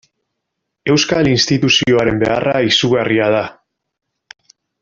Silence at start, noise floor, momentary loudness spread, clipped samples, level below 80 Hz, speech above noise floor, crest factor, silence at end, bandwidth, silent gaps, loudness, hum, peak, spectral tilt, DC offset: 0.85 s; -76 dBFS; 5 LU; under 0.1%; -46 dBFS; 62 dB; 16 dB; 1.3 s; 7.6 kHz; none; -14 LUFS; none; 0 dBFS; -4.5 dB/octave; under 0.1%